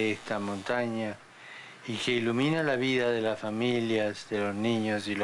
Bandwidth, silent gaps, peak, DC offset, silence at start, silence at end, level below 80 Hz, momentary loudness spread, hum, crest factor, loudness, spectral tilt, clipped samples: 11.5 kHz; none; -16 dBFS; under 0.1%; 0 s; 0 s; -70 dBFS; 12 LU; none; 14 dB; -29 LUFS; -5.5 dB/octave; under 0.1%